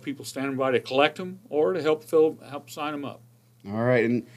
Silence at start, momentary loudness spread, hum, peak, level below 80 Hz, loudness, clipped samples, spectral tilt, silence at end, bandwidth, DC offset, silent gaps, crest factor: 0.05 s; 14 LU; none; -6 dBFS; -76 dBFS; -25 LUFS; under 0.1%; -5.5 dB/octave; 0.15 s; 14.5 kHz; under 0.1%; none; 20 dB